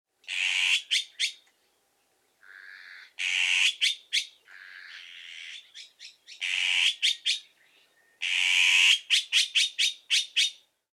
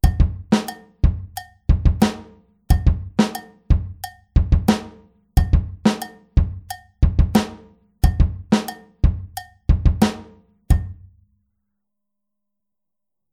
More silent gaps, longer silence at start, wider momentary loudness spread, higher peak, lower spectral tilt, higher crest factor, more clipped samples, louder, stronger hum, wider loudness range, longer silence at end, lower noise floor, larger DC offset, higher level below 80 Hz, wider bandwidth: neither; first, 0.3 s vs 0.05 s; first, 24 LU vs 15 LU; second, -8 dBFS vs -2 dBFS; second, 7.5 dB/octave vs -6.5 dB/octave; about the same, 20 dB vs 18 dB; neither; second, -24 LUFS vs -21 LUFS; neither; first, 6 LU vs 3 LU; second, 0.45 s vs 2.4 s; second, -71 dBFS vs -87 dBFS; neither; second, under -90 dBFS vs -22 dBFS; about the same, 15.5 kHz vs 15.5 kHz